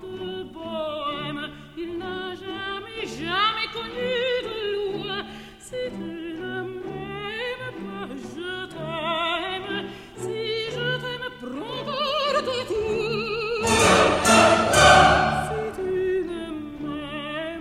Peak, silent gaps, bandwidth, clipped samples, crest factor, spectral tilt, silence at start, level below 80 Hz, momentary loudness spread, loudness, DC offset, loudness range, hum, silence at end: -2 dBFS; none; 16 kHz; under 0.1%; 22 dB; -3.5 dB/octave; 0 s; -46 dBFS; 17 LU; -24 LUFS; under 0.1%; 13 LU; none; 0 s